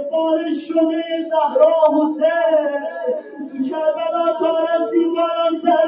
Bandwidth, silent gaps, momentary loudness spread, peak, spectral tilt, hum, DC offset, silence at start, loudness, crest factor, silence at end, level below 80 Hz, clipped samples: 4.9 kHz; none; 9 LU; -2 dBFS; -9 dB/octave; none; under 0.1%; 0 s; -18 LUFS; 16 dB; 0 s; -78 dBFS; under 0.1%